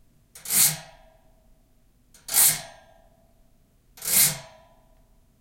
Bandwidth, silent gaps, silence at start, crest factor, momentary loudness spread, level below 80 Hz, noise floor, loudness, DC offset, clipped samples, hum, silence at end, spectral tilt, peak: 16.5 kHz; none; 0.35 s; 24 dB; 19 LU; -60 dBFS; -60 dBFS; -20 LUFS; under 0.1%; under 0.1%; none; 1 s; 0.5 dB/octave; -4 dBFS